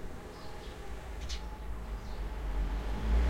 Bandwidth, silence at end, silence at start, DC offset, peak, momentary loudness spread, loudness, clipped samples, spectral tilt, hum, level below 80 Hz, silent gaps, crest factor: 12.5 kHz; 0 s; 0 s; under 0.1%; -20 dBFS; 9 LU; -41 LUFS; under 0.1%; -6 dB/octave; none; -36 dBFS; none; 16 dB